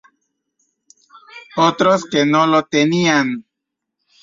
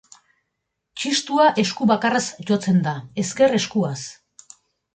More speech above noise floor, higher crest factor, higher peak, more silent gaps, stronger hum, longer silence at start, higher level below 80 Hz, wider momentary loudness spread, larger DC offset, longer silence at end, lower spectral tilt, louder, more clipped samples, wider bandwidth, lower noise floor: first, 65 dB vs 58 dB; about the same, 16 dB vs 16 dB; first, -2 dBFS vs -6 dBFS; neither; neither; first, 1.35 s vs 0.95 s; about the same, -62 dBFS vs -64 dBFS; about the same, 9 LU vs 11 LU; neither; about the same, 0.8 s vs 0.8 s; about the same, -5 dB/octave vs -4.5 dB/octave; first, -15 LUFS vs -20 LUFS; neither; second, 7.6 kHz vs 9.4 kHz; about the same, -80 dBFS vs -78 dBFS